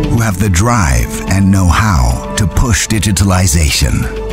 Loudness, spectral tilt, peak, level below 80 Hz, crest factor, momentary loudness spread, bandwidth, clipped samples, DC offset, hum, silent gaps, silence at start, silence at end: -12 LUFS; -4.5 dB/octave; 0 dBFS; -18 dBFS; 10 dB; 5 LU; 16.5 kHz; under 0.1%; under 0.1%; none; none; 0 s; 0 s